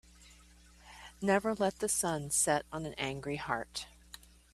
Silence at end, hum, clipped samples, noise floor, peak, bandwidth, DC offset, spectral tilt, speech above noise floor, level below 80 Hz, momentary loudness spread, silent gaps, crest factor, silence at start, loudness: 0.35 s; none; under 0.1%; -59 dBFS; -14 dBFS; 15.5 kHz; under 0.1%; -3 dB/octave; 26 dB; -60 dBFS; 22 LU; none; 22 dB; 0.2 s; -33 LUFS